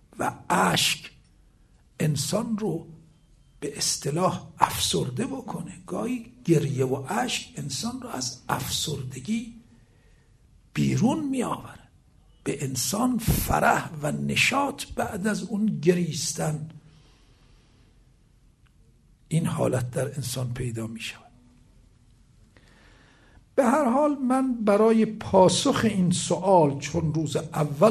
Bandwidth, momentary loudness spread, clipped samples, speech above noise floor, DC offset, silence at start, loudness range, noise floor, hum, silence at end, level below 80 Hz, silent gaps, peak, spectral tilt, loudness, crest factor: 13.5 kHz; 12 LU; under 0.1%; 34 dB; under 0.1%; 0.15 s; 10 LU; -59 dBFS; none; 0 s; -48 dBFS; none; -2 dBFS; -4.5 dB/octave; -25 LUFS; 24 dB